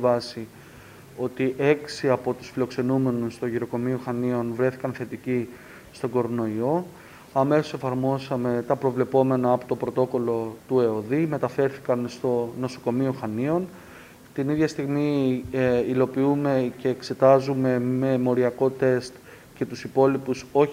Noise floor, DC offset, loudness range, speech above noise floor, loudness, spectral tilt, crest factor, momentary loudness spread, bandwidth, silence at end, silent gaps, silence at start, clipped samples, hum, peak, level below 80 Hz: -46 dBFS; under 0.1%; 5 LU; 23 dB; -25 LUFS; -7.5 dB/octave; 20 dB; 10 LU; 16 kHz; 0 s; none; 0 s; under 0.1%; none; -4 dBFS; -60 dBFS